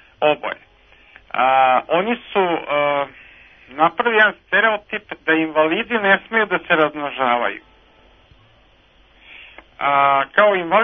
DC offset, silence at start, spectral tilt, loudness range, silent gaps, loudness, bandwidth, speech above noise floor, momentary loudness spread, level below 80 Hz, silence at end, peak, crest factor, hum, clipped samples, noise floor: under 0.1%; 0.2 s; -7.5 dB/octave; 5 LU; none; -17 LUFS; 3.8 kHz; 36 dB; 10 LU; -58 dBFS; 0 s; 0 dBFS; 20 dB; none; under 0.1%; -53 dBFS